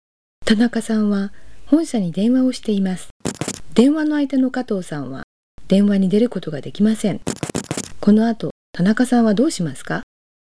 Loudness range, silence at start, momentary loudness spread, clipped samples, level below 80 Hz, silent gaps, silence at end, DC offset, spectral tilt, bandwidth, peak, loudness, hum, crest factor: 2 LU; 0.4 s; 12 LU; under 0.1%; -50 dBFS; 3.11-3.20 s, 5.23-5.58 s, 8.51-8.73 s; 0.5 s; 2%; -6 dB/octave; 11 kHz; -2 dBFS; -19 LUFS; none; 16 dB